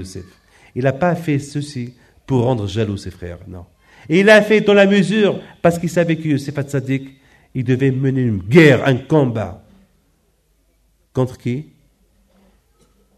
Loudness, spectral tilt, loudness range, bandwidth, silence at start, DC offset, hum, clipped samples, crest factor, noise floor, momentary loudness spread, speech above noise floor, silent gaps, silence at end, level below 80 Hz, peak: -16 LUFS; -6.5 dB/octave; 9 LU; 13.5 kHz; 0 s; under 0.1%; none; under 0.1%; 18 dB; -60 dBFS; 19 LU; 45 dB; none; 1.55 s; -50 dBFS; 0 dBFS